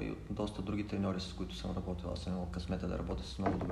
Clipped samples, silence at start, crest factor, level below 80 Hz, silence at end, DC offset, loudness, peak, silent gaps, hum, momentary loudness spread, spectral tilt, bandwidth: under 0.1%; 0 s; 18 dB; -48 dBFS; 0 s; under 0.1%; -39 LUFS; -20 dBFS; none; none; 4 LU; -7 dB/octave; 12 kHz